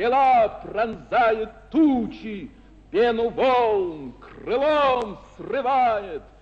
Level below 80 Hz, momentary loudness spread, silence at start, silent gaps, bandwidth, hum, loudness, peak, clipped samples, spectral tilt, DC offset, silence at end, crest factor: -50 dBFS; 17 LU; 0 s; none; 8.2 kHz; none; -22 LUFS; -10 dBFS; under 0.1%; -6.5 dB/octave; under 0.1%; 0.2 s; 12 dB